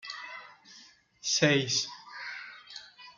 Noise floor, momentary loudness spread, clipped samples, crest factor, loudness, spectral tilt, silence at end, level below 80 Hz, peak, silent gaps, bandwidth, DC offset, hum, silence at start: -57 dBFS; 24 LU; under 0.1%; 24 dB; -29 LUFS; -3 dB/octave; 0.05 s; -74 dBFS; -10 dBFS; none; 11 kHz; under 0.1%; none; 0.05 s